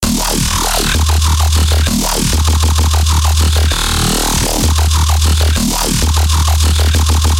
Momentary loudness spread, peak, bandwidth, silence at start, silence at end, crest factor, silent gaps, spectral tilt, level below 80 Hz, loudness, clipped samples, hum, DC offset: 1 LU; -2 dBFS; 16.5 kHz; 0 s; 0 s; 10 dB; none; -3.5 dB/octave; -14 dBFS; -12 LUFS; under 0.1%; none; under 0.1%